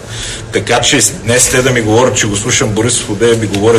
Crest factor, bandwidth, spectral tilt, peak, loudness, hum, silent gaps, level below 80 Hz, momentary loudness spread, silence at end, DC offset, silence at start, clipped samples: 12 dB; over 20 kHz; -3.5 dB/octave; 0 dBFS; -10 LUFS; none; none; -34 dBFS; 7 LU; 0 s; under 0.1%; 0 s; under 0.1%